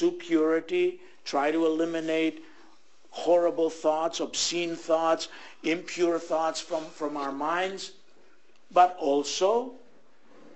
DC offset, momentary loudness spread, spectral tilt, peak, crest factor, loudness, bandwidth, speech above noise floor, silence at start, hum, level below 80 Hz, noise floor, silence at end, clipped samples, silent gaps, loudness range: 0.4%; 11 LU; -3 dB/octave; -8 dBFS; 20 dB; -27 LUFS; 8.6 kHz; 36 dB; 0 s; none; -76 dBFS; -62 dBFS; 0.8 s; under 0.1%; none; 2 LU